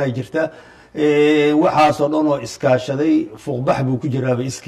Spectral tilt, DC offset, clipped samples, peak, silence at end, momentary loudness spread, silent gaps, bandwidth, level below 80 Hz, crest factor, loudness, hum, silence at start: -6.5 dB/octave; under 0.1%; under 0.1%; -2 dBFS; 0.05 s; 9 LU; none; 12.5 kHz; -54 dBFS; 14 dB; -17 LUFS; none; 0 s